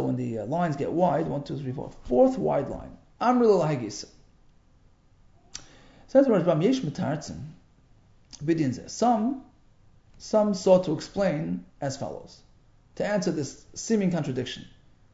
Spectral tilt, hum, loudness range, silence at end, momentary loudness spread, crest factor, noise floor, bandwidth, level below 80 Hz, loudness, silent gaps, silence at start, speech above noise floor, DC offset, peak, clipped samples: -6.5 dB/octave; none; 5 LU; 0.45 s; 18 LU; 20 dB; -59 dBFS; 8 kHz; -54 dBFS; -26 LUFS; none; 0 s; 33 dB; under 0.1%; -8 dBFS; under 0.1%